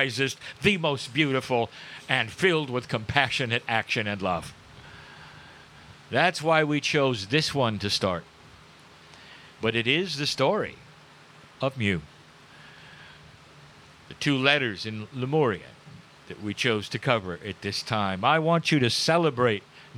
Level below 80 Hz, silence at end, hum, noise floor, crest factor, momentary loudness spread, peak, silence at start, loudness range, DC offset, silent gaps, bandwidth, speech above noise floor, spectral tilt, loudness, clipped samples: -60 dBFS; 0 s; none; -51 dBFS; 24 dB; 15 LU; -4 dBFS; 0 s; 4 LU; under 0.1%; none; 15.5 kHz; 26 dB; -4.5 dB/octave; -25 LUFS; under 0.1%